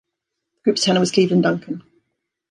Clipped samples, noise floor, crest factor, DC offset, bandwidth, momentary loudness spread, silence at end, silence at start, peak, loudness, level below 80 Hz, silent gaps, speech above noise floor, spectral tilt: under 0.1%; -80 dBFS; 18 dB; under 0.1%; 11 kHz; 14 LU; 0.7 s; 0.65 s; -2 dBFS; -18 LUFS; -66 dBFS; none; 62 dB; -5 dB/octave